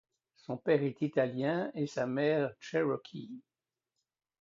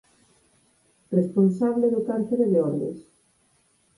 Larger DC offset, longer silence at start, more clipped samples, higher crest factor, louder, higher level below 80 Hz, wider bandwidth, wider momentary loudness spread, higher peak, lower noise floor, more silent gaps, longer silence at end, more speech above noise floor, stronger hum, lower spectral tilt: neither; second, 0.5 s vs 1.1 s; neither; about the same, 18 dB vs 16 dB; second, -33 LUFS vs -23 LUFS; second, -78 dBFS vs -68 dBFS; second, 7.6 kHz vs 11 kHz; first, 16 LU vs 9 LU; second, -16 dBFS vs -8 dBFS; first, -89 dBFS vs -65 dBFS; neither; about the same, 1 s vs 0.95 s; first, 56 dB vs 43 dB; neither; second, -7 dB/octave vs -10.5 dB/octave